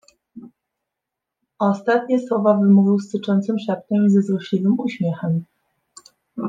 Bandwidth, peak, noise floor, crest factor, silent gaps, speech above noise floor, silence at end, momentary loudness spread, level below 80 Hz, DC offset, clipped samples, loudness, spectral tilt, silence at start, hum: 7.6 kHz; -4 dBFS; -83 dBFS; 16 dB; none; 65 dB; 0 s; 9 LU; -70 dBFS; under 0.1%; under 0.1%; -19 LUFS; -8.5 dB/octave; 0.35 s; none